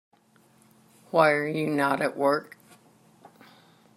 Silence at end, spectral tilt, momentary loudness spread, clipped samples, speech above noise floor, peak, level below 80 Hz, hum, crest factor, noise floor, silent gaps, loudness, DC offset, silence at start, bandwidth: 1.55 s; -6 dB/octave; 6 LU; under 0.1%; 37 dB; -6 dBFS; -78 dBFS; none; 22 dB; -61 dBFS; none; -25 LUFS; under 0.1%; 1.15 s; 15 kHz